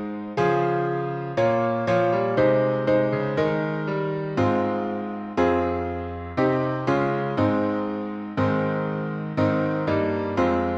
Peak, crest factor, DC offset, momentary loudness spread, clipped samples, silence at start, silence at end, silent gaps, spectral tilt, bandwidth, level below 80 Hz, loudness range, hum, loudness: -8 dBFS; 14 dB; under 0.1%; 7 LU; under 0.1%; 0 s; 0 s; none; -8.5 dB/octave; 7.6 kHz; -52 dBFS; 2 LU; none; -24 LUFS